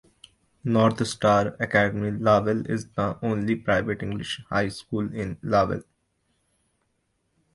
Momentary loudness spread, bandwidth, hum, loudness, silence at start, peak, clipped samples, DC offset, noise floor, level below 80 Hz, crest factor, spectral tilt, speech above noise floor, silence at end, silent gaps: 9 LU; 11.5 kHz; none; -25 LUFS; 0.65 s; -4 dBFS; under 0.1%; under 0.1%; -73 dBFS; -52 dBFS; 20 dB; -6 dB/octave; 49 dB; 1.7 s; none